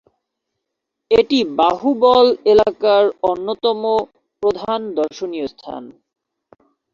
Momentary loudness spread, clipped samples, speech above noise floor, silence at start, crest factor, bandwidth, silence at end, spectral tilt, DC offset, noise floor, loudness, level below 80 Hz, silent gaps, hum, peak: 14 LU; under 0.1%; 63 dB; 1.1 s; 16 dB; 7.4 kHz; 1.05 s; -5.5 dB/octave; under 0.1%; -79 dBFS; -16 LUFS; -52 dBFS; none; none; -2 dBFS